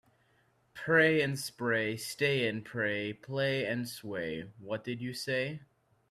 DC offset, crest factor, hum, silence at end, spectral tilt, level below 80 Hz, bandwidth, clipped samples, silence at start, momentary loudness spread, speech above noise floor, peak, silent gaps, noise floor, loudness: under 0.1%; 20 dB; none; 0.45 s; -5 dB/octave; -70 dBFS; 14.5 kHz; under 0.1%; 0.75 s; 13 LU; 38 dB; -12 dBFS; none; -70 dBFS; -32 LUFS